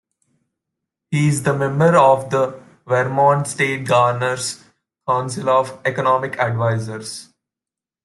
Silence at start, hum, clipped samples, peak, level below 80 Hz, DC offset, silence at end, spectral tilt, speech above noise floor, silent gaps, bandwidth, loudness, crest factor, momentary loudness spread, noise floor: 1.1 s; none; under 0.1%; -2 dBFS; -60 dBFS; under 0.1%; 0.8 s; -5.5 dB/octave; 71 dB; none; 12.5 kHz; -18 LUFS; 18 dB; 12 LU; -88 dBFS